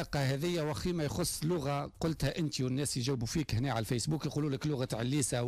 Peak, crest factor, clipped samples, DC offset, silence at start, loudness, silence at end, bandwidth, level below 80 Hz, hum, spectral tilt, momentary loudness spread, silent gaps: -20 dBFS; 14 dB; under 0.1%; under 0.1%; 0 s; -34 LUFS; 0 s; 15.5 kHz; -52 dBFS; none; -5 dB/octave; 2 LU; none